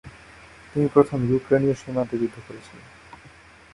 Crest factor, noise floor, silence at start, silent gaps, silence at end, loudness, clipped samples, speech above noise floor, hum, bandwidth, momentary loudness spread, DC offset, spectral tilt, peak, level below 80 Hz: 22 dB; -49 dBFS; 0.05 s; none; 0.95 s; -23 LUFS; under 0.1%; 27 dB; none; 11.5 kHz; 23 LU; under 0.1%; -8.5 dB/octave; -2 dBFS; -54 dBFS